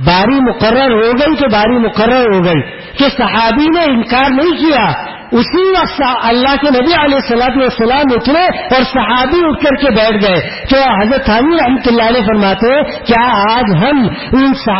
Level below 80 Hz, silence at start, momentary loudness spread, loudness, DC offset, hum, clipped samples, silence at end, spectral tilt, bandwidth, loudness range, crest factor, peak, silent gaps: -32 dBFS; 0 s; 3 LU; -10 LUFS; under 0.1%; none; under 0.1%; 0 s; -9.5 dB/octave; 5.8 kHz; 1 LU; 10 dB; 0 dBFS; none